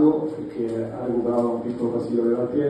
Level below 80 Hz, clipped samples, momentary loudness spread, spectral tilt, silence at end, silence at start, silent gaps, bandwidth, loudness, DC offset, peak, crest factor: -58 dBFS; under 0.1%; 6 LU; -9 dB/octave; 0 s; 0 s; none; 9.4 kHz; -24 LUFS; under 0.1%; -6 dBFS; 16 dB